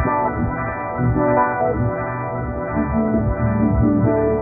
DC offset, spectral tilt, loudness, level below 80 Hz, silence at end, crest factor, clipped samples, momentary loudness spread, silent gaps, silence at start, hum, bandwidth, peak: under 0.1%; -11.5 dB/octave; -20 LUFS; -30 dBFS; 0 s; 16 dB; under 0.1%; 7 LU; none; 0 s; none; 2.6 kHz; -4 dBFS